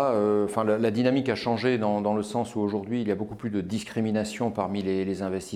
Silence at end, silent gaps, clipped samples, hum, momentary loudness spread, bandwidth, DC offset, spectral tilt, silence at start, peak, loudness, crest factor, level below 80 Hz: 0 s; none; under 0.1%; none; 7 LU; 13.5 kHz; under 0.1%; -6.5 dB/octave; 0 s; -10 dBFS; -27 LUFS; 16 dB; -62 dBFS